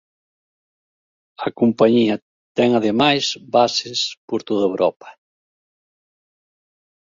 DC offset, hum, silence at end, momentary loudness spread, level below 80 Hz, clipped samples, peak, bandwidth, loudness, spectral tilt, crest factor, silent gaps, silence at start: under 0.1%; none; 1.9 s; 12 LU; -62 dBFS; under 0.1%; -2 dBFS; 7.6 kHz; -19 LUFS; -4.5 dB/octave; 20 dB; 2.22-2.55 s, 4.17-4.28 s; 1.4 s